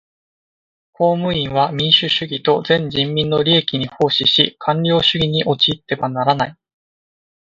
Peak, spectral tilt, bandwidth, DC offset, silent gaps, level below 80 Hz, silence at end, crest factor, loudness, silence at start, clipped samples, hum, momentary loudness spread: 0 dBFS; -6 dB/octave; 7.6 kHz; under 0.1%; none; -50 dBFS; 0.9 s; 18 dB; -16 LUFS; 1 s; under 0.1%; none; 6 LU